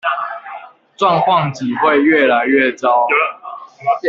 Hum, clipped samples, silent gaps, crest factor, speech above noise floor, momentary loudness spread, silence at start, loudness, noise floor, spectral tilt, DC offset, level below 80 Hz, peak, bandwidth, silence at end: none; under 0.1%; none; 14 dB; 21 dB; 19 LU; 0.05 s; -14 LUFS; -34 dBFS; -6 dB/octave; under 0.1%; -62 dBFS; -2 dBFS; 7.6 kHz; 0 s